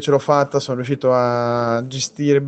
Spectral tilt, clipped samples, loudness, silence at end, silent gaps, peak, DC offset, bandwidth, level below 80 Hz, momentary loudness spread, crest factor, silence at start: -5.5 dB/octave; under 0.1%; -18 LUFS; 0 s; none; -2 dBFS; under 0.1%; 8.8 kHz; -60 dBFS; 6 LU; 16 dB; 0 s